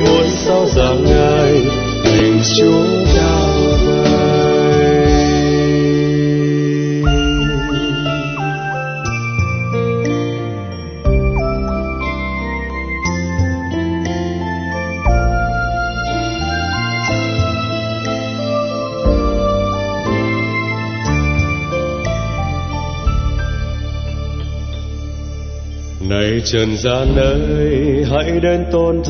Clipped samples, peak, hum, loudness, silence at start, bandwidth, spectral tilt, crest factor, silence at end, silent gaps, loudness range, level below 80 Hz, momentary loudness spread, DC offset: under 0.1%; 0 dBFS; none; -16 LUFS; 0 s; 6.6 kHz; -6 dB/octave; 14 dB; 0 s; none; 7 LU; -22 dBFS; 10 LU; under 0.1%